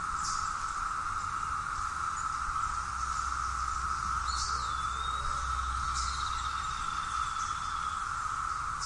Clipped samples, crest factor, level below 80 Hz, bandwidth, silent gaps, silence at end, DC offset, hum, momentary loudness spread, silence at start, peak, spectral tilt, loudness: under 0.1%; 14 dB; -44 dBFS; 11.5 kHz; none; 0 s; under 0.1%; none; 2 LU; 0 s; -20 dBFS; -1.5 dB/octave; -33 LUFS